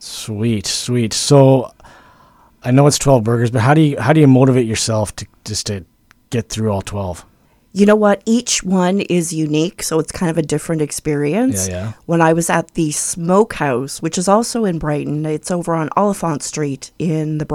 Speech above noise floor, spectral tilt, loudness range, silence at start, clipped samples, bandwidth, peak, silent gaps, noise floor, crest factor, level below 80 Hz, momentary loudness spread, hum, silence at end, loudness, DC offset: 34 dB; -5.5 dB/octave; 5 LU; 0 s; under 0.1%; 16 kHz; 0 dBFS; none; -49 dBFS; 16 dB; -44 dBFS; 12 LU; none; 0 s; -16 LUFS; under 0.1%